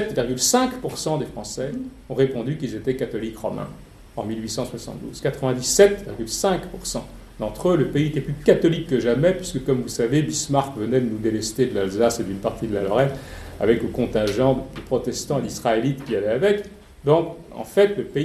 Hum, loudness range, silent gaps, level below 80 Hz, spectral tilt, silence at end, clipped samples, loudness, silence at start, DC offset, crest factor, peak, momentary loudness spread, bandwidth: none; 6 LU; none; -44 dBFS; -5 dB/octave; 0 s; under 0.1%; -22 LUFS; 0 s; under 0.1%; 22 dB; -2 dBFS; 11 LU; 14.5 kHz